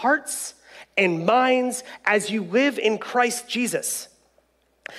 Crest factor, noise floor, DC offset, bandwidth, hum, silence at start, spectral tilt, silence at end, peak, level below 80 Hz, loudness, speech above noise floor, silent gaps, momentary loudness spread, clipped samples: 18 dB; -64 dBFS; under 0.1%; 15 kHz; none; 0 s; -3 dB/octave; 0 s; -6 dBFS; -72 dBFS; -22 LUFS; 42 dB; none; 11 LU; under 0.1%